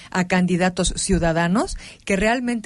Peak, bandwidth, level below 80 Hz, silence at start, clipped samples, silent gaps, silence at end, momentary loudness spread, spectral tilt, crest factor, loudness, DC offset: -6 dBFS; 11.5 kHz; -34 dBFS; 0 s; under 0.1%; none; 0.05 s; 5 LU; -5 dB/octave; 14 dB; -20 LUFS; under 0.1%